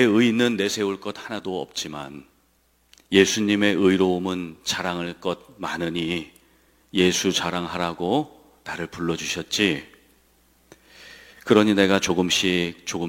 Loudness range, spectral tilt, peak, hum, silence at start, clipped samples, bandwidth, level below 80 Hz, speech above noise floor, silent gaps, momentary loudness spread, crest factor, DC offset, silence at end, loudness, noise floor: 4 LU; -4 dB/octave; -2 dBFS; none; 0 s; under 0.1%; 16.5 kHz; -60 dBFS; 41 dB; none; 14 LU; 22 dB; under 0.1%; 0 s; -23 LUFS; -63 dBFS